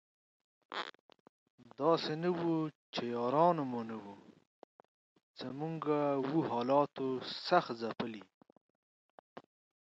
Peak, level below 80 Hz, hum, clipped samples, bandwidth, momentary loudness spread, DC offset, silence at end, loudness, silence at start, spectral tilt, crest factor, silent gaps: -14 dBFS; -82 dBFS; none; under 0.1%; 7.8 kHz; 14 LU; under 0.1%; 0.5 s; -35 LUFS; 0.7 s; -7 dB/octave; 24 dB; 1.00-1.09 s, 1.20-1.58 s, 2.75-2.93 s, 4.47-4.79 s, 4.88-5.16 s, 5.23-5.34 s, 8.34-8.41 s, 8.52-9.36 s